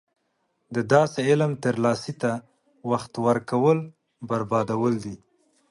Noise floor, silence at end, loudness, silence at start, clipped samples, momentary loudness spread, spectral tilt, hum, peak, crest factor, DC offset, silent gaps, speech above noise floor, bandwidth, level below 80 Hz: -73 dBFS; 0.55 s; -24 LUFS; 0.7 s; under 0.1%; 15 LU; -6.5 dB/octave; none; -4 dBFS; 20 dB; under 0.1%; none; 50 dB; 11.5 kHz; -64 dBFS